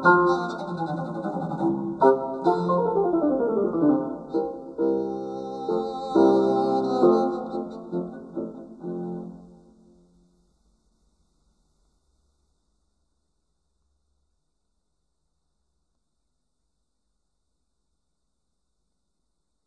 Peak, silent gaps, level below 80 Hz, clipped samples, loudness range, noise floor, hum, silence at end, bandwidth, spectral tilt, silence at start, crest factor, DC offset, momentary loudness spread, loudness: -6 dBFS; none; -62 dBFS; under 0.1%; 15 LU; -79 dBFS; none; 10.2 s; 8.2 kHz; -8 dB/octave; 0 s; 22 dB; under 0.1%; 15 LU; -24 LUFS